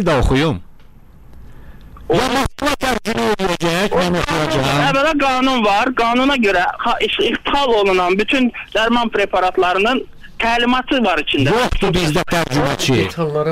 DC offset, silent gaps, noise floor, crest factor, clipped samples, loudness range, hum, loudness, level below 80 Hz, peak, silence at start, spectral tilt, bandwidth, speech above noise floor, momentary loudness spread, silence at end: under 0.1%; none; -40 dBFS; 10 dB; under 0.1%; 4 LU; none; -16 LUFS; -32 dBFS; -6 dBFS; 0 s; -5 dB/octave; 16 kHz; 25 dB; 4 LU; 0 s